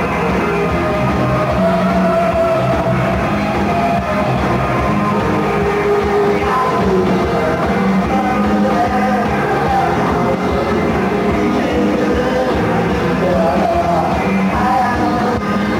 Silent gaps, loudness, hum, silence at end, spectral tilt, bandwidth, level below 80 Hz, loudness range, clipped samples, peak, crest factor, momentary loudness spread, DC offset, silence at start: none; -15 LUFS; none; 0 s; -7 dB/octave; 16 kHz; -32 dBFS; 1 LU; under 0.1%; -4 dBFS; 10 dB; 2 LU; under 0.1%; 0 s